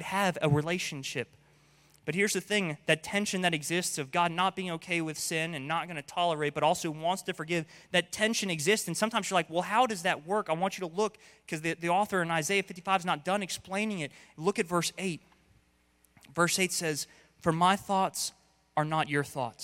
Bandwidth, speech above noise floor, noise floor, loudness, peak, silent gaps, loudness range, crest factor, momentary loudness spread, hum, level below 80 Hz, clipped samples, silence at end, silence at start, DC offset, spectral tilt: 16.5 kHz; 37 dB; -68 dBFS; -30 LUFS; -10 dBFS; none; 3 LU; 20 dB; 8 LU; none; -68 dBFS; under 0.1%; 0 s; 0 s; under 0.1%; -3.5 dB/octave